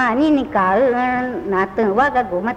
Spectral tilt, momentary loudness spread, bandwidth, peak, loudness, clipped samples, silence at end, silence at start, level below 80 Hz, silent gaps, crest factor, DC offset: -7 dB/octave; 5 LU; 8.6 kHz; -4 dBFS; -17 LUFS; under 0.1%; 0 s; 0 s; -46 dBFS; none; 12 dB; under 0.1%